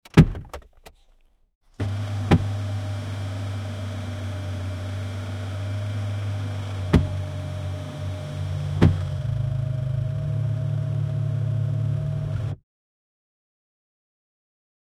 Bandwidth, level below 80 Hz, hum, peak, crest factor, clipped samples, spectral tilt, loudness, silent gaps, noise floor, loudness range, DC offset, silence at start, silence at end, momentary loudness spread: 11.5 kHz; -40 dBFS; none; 0 dBFS; 26 dB; under 0.1%; -7.5 dB/octave; -26 LUFS; 1.55-1.61 s; -58 dBFS; 5 LU; under 0.1%; 0.15 s; 2.45 s; 10 LU